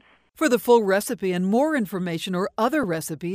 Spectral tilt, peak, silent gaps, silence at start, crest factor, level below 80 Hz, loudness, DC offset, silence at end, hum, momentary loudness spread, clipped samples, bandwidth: -5.5 dB/octave; -6 dBFS; none; 0.4 s; 16 dB; -62 dBFS; -23 LUFS; under 0.1%; 0 s; none; 9 LU; under 0.1%; 16 kHz